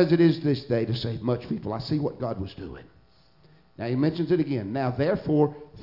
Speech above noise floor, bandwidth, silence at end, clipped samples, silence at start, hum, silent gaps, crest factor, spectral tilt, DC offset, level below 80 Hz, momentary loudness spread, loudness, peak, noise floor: 34 dB; 5.8 kHz; 0 s; under 0.1%; 0 s; none; none; 20 dB; -9 dB/octave; under 0.1%; -54 dBFS; 13 LU; -26 LUFS; -6 dBFS; -59 dBFS